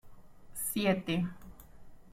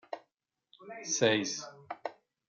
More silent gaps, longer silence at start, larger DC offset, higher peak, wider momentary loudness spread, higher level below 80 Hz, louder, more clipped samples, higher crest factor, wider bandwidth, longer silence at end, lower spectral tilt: neither; about the same, 0.05 s vs 0.1 s; neither; about the same, -14 dBFS vs -12 dBFS; first, 22 LU vs 19 LU; first, -58 dBFS vs -84 dBFS; about the same, -33 LUFS vs -32 LUFS; neither; about the same, 22 dB vs 24 dB; first, 16.5 kHz vs 10.5 kHz; second, 0 s vs 0.35 s; first, -4.5 dB/octave vs -2.5 dB/octave